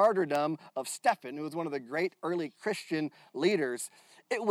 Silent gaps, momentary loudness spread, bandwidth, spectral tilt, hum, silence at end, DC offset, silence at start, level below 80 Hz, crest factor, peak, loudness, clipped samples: none; 9 LU; 15.5 kHz; -4.5 dB/octave; none; 0 s; under 0.1%; 0 s; -88 dBFS; 18 dB; -14 dBFS; -33 LUFS; under 0.1%